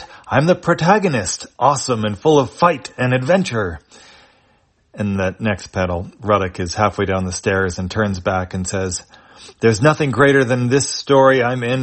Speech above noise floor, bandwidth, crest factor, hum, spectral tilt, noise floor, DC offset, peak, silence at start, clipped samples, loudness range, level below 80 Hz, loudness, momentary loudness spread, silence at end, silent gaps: 41 dB; 8.8 kHz; 16 dB; none; -5 dB/octave; -58 dBFS; under 0.1%; 0 dBFS; 0 s; under 0.1%; 5 LU; -48 dBFS; -17 LUFS; 9 LU; 0 s; none